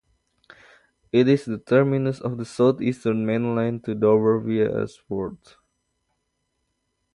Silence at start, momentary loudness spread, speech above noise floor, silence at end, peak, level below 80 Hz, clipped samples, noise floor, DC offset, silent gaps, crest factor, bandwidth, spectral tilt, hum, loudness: 1.15 s; 11 LU; 53 dB; 1.8 s; -6 dBFS; -60 dBFS; under 0.1%; -75 dBFS; under 0.1%; none; 18 dB; 11 kHz; -8 dB/octave; none; -22 LUFS